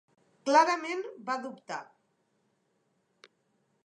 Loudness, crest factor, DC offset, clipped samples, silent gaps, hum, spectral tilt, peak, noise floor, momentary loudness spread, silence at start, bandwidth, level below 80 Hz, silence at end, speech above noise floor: -29 LUFS; 24 dB; under 0.1%; under 0.1%; none; none; -2.5 dB/octave; -10 dBFS; -75 dBFS; 17 LU; 0.45 s; 10.5 kHz; under -90 dBFS; 2 s; 46 dB